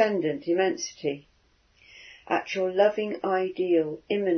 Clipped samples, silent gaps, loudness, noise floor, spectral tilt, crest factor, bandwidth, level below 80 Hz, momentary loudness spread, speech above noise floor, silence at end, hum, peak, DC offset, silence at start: under 0.1%; none; -27 LUFS; -63 dBFS; -5 dB/octave; 18 dB; 6.6 kHz; -70 dBFS; 9 LU; 38 dB; 0 s; none; -8 dBFS; under 0.1%; 0 s